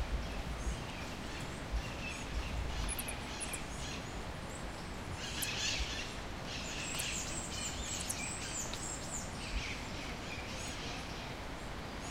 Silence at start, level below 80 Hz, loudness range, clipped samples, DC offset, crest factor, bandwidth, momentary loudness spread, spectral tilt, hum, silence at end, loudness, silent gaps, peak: 0 s; -46 dBFS; 3 LU; under 0.1%; under 0.1%; 18 dB; 16 kHz; 7 LU; -3 dB/octave; none; 0 s; -40 LUFS; none; -22 dBFS